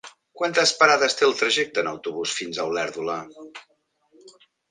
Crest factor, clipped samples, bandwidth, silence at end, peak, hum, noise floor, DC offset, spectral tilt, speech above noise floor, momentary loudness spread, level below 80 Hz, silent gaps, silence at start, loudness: 24 dB; under 0.1%; 10 kHz; 0.4 s; -2 dBFS; none; -59 dBFS; under 0.1%; -1.5 dB/octave; 36 dB; 15 LU; -70 dBFS; none; 0.05 s; -22 LUFS